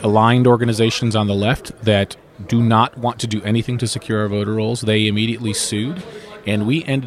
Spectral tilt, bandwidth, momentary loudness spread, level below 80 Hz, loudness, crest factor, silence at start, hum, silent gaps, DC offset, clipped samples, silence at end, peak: -5.5 dB/octave; 14 kHz; 9 LU; -48 dBFS; -18 LUFS; 16 dB; 0 s; none; none; under 0.1%; under 0.1%; 0 s; -2 dBFS